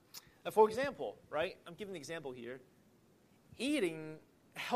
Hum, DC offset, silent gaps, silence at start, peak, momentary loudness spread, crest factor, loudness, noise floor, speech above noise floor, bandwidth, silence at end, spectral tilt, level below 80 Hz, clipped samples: none; under 0.1%; none; 0.15 s; -16 dBFS; 20 LU; 22 dB; -37 LUFS; -68 dBFS; 31 dB; 15 kHz; 0 s; -4.5 dB/octave; -76 dBFS; under 0.1%